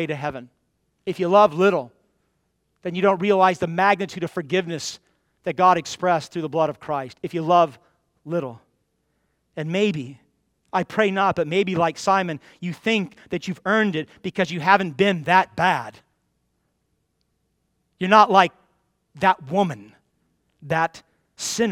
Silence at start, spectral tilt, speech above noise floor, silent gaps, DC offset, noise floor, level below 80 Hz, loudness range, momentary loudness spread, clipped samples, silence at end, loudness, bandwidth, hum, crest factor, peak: 0 s; -5 dB/octave; 51 dB; none; under 0.1%; -72 dBFS; -64 dBFS; 4 LU; 15 LU; under 0.1%; 0 s; -21 LUFS; 15.5 kHz; none; 22 dB; 0 dBFS